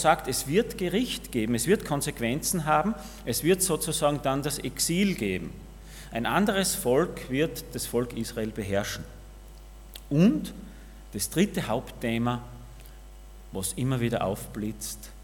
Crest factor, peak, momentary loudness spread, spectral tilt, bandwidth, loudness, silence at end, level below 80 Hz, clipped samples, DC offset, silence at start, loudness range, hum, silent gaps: 22 dB; -6 dBFS; 17 LU; -4.5 dB/octave; 18 kHz; -27 LUFS; 0 s; -46 dBFS; under 0.1%; under 0.1%; 0 s; 5 LU; none; none